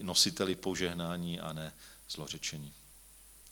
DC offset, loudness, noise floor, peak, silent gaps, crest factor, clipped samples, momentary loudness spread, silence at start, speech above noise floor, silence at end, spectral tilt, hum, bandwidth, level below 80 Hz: under 0.1%; -34 LUFS; -57 dBFS; -14 dBFS; none; 24 dB; under 0.1%; 26 LU; 0 s; 22 dB; 0 s; -3 dB/octave; none; 19 kHz; -62 dBFS